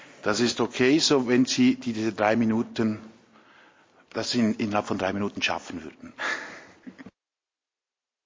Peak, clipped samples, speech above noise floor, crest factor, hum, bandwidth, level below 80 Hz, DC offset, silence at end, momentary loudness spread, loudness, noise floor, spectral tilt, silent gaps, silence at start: -6 dBFS; under 0.1%; over 65 dB; 20 dB; none; 7.6 kHz; -62 dBFS; under 0.1%; 1.15 s; 18 LU; -25 LUFS; under -90 dBFS; -4 dB/octave; none; 0 s